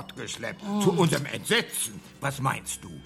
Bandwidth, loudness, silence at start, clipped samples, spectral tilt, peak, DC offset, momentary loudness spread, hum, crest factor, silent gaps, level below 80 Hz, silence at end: 16 kHz; -27 LUFS; 0 s; under 0.1%; -4 dB/octave; -8 dBFS; under 0.1%; 11 LU; none; 20 dB; none; -58 dBFS; 0 s